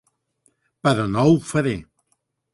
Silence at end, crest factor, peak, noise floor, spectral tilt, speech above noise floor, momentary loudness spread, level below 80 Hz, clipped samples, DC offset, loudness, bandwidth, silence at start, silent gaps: 0.7 s; 18 dB; -4 dBFS; -71 dBFS; -6.5 dB/octave; 52 dB; 8 LU; -52 dBFS; under 0.1%; under 0.1%; -20 LUFS; 11.5 kHz; 0.85 s; none